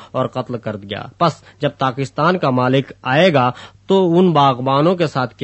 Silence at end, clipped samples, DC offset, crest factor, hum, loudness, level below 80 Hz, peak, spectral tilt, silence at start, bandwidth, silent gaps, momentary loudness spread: 0.15 s; under 0.1%; under 0.1%; 16 dB; none; -16 LUFS; -56 dBFS; 0 dBFS; -7 dB/octave; 0 s; 8.4 kHz; none; 12 LU